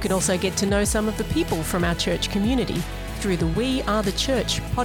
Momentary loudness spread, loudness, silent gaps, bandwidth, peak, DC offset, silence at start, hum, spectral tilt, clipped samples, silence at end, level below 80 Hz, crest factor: 4 LU; -23 LUFS; none; 19.5 kHz; -10 dBFS; 0.1%; 0 s; none; -4.5 dB/octave; under 0.1%; 0 s; -34 dBFS; 14 dB